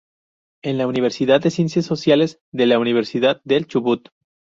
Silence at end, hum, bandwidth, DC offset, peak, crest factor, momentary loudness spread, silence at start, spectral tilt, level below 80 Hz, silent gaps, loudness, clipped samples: 0.6 s; none; 7.8 kHz; under 0.1%; -2 dBFS; 16 dB; 6 LU; 0.65 s; -6 dB/octave; -60 dBFS; 2.41-2.52 s; -19 LUFS; under 0.1%